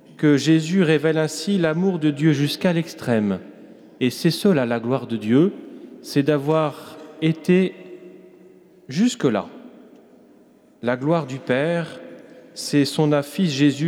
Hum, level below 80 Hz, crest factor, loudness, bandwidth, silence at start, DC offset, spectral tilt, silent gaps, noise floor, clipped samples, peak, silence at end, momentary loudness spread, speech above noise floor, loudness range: none; -70 dBFS; 16 dB; -21 LUFS; 16 kHz; 0.2 s; under 0.1%; -6 dB/octave; none; -52 dBFS; under 0.1%; -6 dBFS; 0 s; 17 LU; 33 dB; 5 LU